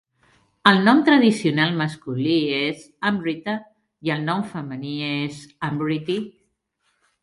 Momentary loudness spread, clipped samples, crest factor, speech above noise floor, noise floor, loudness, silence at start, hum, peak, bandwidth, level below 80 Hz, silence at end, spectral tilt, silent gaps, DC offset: 15 LU; under 0.1%; 22 dB; 50 dB; -71 dBFS; -21 LUFS; 0.65 s; none; 0 dBFS; 11.5 kHz; -64 dBFS; 0.95 s; -6 dB/octave; none; under 0.1%